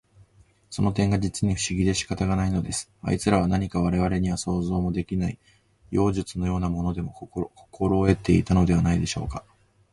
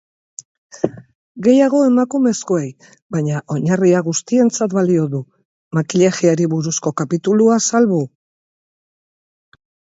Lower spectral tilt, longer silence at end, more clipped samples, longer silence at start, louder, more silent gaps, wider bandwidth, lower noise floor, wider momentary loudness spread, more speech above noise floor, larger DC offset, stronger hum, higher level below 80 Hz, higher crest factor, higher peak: about the same, -6 dB/octave vs -6 dB/octave; second, 0.55 s vs 1.85 s; neither; about the same, 0.7 s vs 0.75 s; second, -25 LUFS vs -16 LUFS; second, none vs 1.15-1.35 s, 3.02-3.10 s, 5.45-5.71 s; first, 11.5 kHz vs 8 kHz; second, -58 dBFS vs under -90 dBFS; about the same, 12 LU vs 12 LU; second, 34 dB vs over 75 dB; neither; neither; first, -38 dBFS vs -62 dBFS; about the same, 20 dB vs 16 dB; second, -6 dBFS vs 0 dBFS